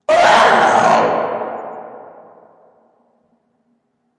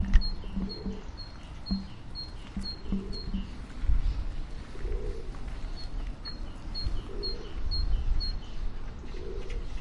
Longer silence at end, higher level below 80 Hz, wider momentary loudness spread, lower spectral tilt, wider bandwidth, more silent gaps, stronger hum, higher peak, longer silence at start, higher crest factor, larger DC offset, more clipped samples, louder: first, 2.1 s vs 0 s; second, -58 dBFS vs -32 dBFS; first, 22 LU vs 10 LU; second, -3 dB/octave vs -6.5 dB/octave; first, 11.5 kHz vs 7.4 kHz; neither; neither; first, 0 dBFS vs -6 dBFS; about the same, 0.1 s vs 0 s; second, 16 dB vs 24 dB; neither; neither; first, -13 LUFS vs -37 LUFS